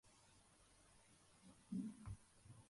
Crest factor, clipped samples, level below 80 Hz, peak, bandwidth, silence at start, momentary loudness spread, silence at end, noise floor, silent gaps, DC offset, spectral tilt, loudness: 20 dB; under 0.1%; -70 dBFS; -38 dBFS; 11.5 kHz; 0.05 s; 18 LU; 0 s; -72 dBFS; none; under 0.1%; -6 dB/octave; -53 LUFS